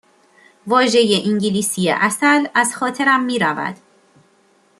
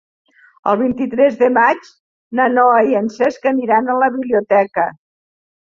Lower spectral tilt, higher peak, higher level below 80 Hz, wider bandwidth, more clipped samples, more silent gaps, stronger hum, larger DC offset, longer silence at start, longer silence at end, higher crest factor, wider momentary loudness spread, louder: second, -3.5 dB/octave vs -6.5 dB/octave; about the same, -2 dBFS vs -2 dBFS; about the same, -64 dBFS vs -60 dBFS; first, 13 kHz vs 7.2 kHz; neither; second, none vs 2.00-2.31 s; neither; neither; about the same, 0.65 s vs 0.65 s; first, 1.05 s vs 0.85 s; about the same, 16 dB vs 14 dB; about the same, 6 LU vs 8 LU; about the same, -16 LUFS vs -15 LUFS